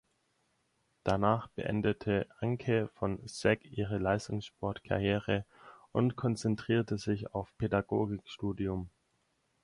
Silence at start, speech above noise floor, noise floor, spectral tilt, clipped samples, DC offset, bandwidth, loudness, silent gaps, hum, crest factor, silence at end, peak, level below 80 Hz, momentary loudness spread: 1.05 s; 44 dB; -76 dBFS; -7 dB/octave; under 0.1%; under 0.1%; 11.5 kHz; -34 LUFS; none; none; 22 dB; 0.75 s; -12 dBFS; -56 dBFS; 8 LU